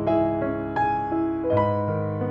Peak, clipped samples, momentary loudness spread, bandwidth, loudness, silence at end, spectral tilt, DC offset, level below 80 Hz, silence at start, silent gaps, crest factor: -10 dBFS; under 0.1%; 4 LU; 5.4 kHz; -24 LUFS; 0 s; -10 dB/octave; under 0.1%; -48 dBFS; 0 s; none; 14 dB